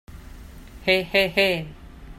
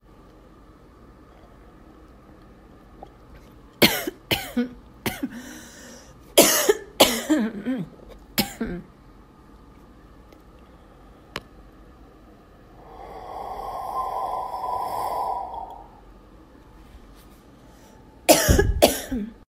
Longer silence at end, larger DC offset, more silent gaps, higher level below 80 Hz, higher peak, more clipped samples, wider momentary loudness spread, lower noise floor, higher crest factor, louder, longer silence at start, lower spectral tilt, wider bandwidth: about the same, 0.05 s vs 0.15 s; neither; neither; about the same, -44 dBFS vs -40 dBFS; second, -6 dBFS vs 0 dBFS; neither; second, 10 LU vs 23 LU; second, -41 dBFS vs -50 dBFS; second, 20 dB vs 28 dB; about the same, -21 LUFS vs -23 LUFS; second, 0.1 s vs 2 s; first, -4.5 dB/octave vs -3 dB/octave; about the same, 15.5 kHz vs 16 kHz